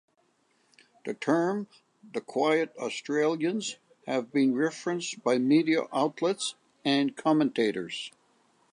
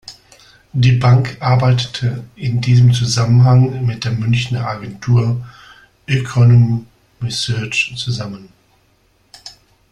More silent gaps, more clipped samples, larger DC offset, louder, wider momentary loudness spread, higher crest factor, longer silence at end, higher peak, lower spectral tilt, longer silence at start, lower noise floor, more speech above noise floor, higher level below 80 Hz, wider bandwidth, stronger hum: neither; neither; neither; second, -28 LUFS vs -15 LUFS; second, 13 LU vs 16 LU; about the same, 18 dB vs 14 dB; first, 0.65 s vs 0.4 s; second, -12 dBFS vs -2 dBFS; second, -4.5 dB/octave vs -6 dB/octave; first, 1.05 s vs 0.1 s; first, -70 dBFS vs -56 dBFS; about the same, 42 dB vs 43 dB; second, -82 dBFS vs -44 dBFS; about the same, 11 kHz vs 10.5 kHz; neither